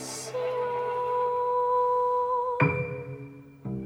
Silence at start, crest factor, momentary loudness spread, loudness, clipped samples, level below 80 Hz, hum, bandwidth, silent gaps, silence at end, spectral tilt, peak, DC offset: 0 s; 18 dB; 15 LU; -27 LUFS; under 0.1%; -62 dBFS; none; 15.5 kHz; none; 0 s; -5.5 dB/octave; -10 dBFS; under 0.1%